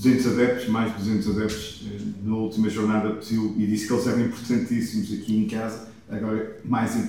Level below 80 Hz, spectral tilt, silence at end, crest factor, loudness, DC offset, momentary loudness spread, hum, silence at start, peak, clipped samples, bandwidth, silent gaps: -52 dBFS; -6 dB/octave; 0 s; 16 dB; -25 LUFS; 0.2%; 10 LU; none; 0 s; -8 dBFS; under 0.1%; 16.5 kHz; none